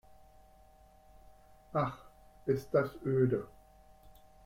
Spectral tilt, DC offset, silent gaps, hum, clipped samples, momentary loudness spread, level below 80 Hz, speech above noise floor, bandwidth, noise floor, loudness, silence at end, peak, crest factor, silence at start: -8.5 dB/octave; under 0.1%; none; none; under 0.1%; 13 LU; -62 dBFS; 29 dB; 16 kHz; -61 dBFS; -34 LUFS; 0.35 s; -16 dBFS; 20 dB; 1.75 s